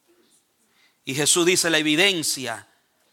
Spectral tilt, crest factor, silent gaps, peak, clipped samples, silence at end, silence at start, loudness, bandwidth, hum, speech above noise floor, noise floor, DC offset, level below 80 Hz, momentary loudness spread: -2 dB/octave; 20 dB; none; -4 dBFS; under 0.1%; 0.5 s; 1.05 s; -19 LUFS; 17 kHz; none; 42 dB; -63 dBFS; under 0.1%; -72 dBFS; 16 LU